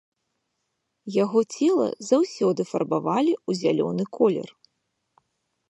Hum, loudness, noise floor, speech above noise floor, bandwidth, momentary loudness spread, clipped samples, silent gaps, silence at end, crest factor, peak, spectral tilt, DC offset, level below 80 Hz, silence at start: none; -24 LUFS; -78 dBFS; 55 dB; 11.5 kHz; 6 LU; under 0.1%; none; 1.25 s; 18 dB; -6 dBFS; -6 dB/octave; under 0.1%; -76 dBFS; 1.05 s